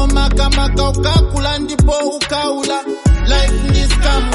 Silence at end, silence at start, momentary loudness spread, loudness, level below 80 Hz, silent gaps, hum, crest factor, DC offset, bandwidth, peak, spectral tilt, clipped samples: 0 s; 0 s; 4 LU; -15 LUFS; -14 dBFS; none; none; 12 dB; under 0.1%; 11.5 kHz; 0 dBFS; -5 dB/octave; under 0.1%